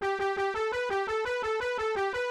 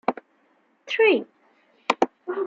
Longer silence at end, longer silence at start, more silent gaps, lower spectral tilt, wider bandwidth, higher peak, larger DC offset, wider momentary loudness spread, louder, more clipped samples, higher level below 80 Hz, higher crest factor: about the same, 0 s vs 0 s; about the same, 0 s vs 0.1 s; neither; about the same, -3.5 dB/octave vs -4 dB/octave; first, 12 kHz vs 7.6 kHz; second, -20 dBFS vs -2 dBFS; neither; second, 1 LU vs 19 LU; second, -30 LUFS vs -23 LUFS; neither; first, -58 dBFS vs -76 dBFS; second, 10 dB vs 24 dB